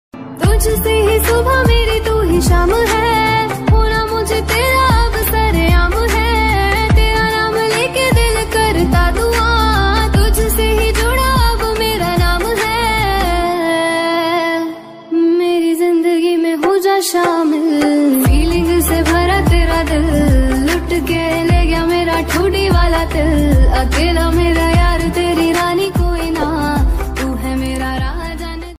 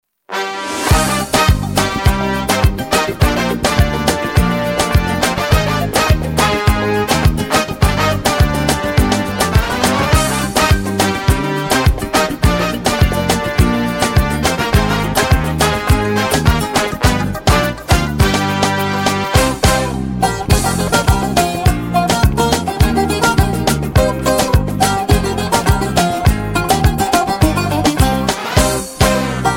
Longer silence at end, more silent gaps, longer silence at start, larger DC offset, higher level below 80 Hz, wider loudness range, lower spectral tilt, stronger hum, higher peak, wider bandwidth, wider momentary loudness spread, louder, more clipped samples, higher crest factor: about the same, 0 s vs 0 s; neither; second, 0.15 s vs 0.3 s; neither; about the same, -18 dBFS vs -22 dBFS; about the same, 2 LU vs 1 LU; about the same, -5 dB/octave vs -4.5 dB/octave; neither; about the same, -2 dBFS vs 0 dBFS; about the same, 16 kHz vs 17 kHz; about the same, 4 LU vs 2 LU; about the same, -14 LUFS vs -14 LUFS; neither; about the same, 12 dB vs 14 dB